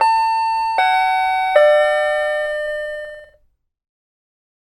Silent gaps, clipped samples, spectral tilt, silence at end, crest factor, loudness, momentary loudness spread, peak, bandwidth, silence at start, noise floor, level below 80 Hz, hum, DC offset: none; under 0.1%; 0 dB/octave; 1.4 s; 16 dB; -16 LUFS; 12 LU; -2 dBFS; 13.5 kHz; 0 s; -59 dBFS; -54 dBFS; none; under 0.1%